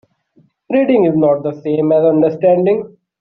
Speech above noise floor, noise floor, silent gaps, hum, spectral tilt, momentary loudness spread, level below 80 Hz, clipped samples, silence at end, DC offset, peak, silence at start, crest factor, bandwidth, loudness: 42 dB; -55 dBFS; none; none; -8 dB/octave; 7 LU; -58 dBFS; under 0.1%; 0.35 s; under 0.1%; -2 dBFS; 0.7 s; 12 dB; 4.3 kHz; -14 LUFS